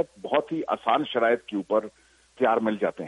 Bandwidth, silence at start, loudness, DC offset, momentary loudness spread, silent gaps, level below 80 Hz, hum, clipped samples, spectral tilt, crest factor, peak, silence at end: 11 kHz; 0 s; -26 LUFS; under 0.1%; 4 LU; none; -68 dBFS; none; under 0.1%; -6 dB/octave; 18 dB; -8 dBFS; 0 s